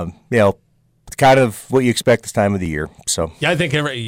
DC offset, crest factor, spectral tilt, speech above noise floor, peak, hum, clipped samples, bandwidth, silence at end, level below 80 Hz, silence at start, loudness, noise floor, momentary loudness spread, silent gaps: under 0.1%; 12 dB; -4.5 dB/octave; 24 dB; -6 dBFS; none; under 0.1%; 16.5 kHz; 0 s; -42 dBFS; 0 s; -17 LUFS; -41 dBFS; 10 LU; none